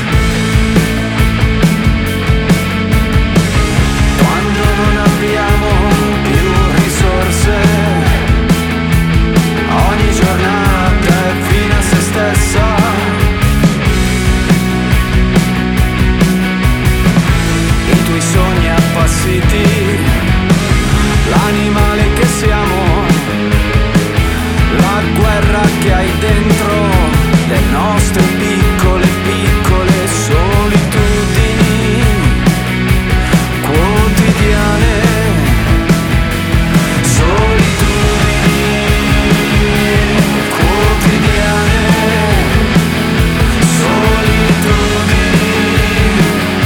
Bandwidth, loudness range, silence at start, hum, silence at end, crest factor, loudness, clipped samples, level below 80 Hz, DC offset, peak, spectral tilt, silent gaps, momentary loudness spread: 18.5 kHz; 1 LU; 0 s; none; 0 s; 10 dB; -11 LUFS; under 0.1%; -16 dBFS; under 0.1%; 0 dBFS; -5.5 dB/octave; none; 2 LU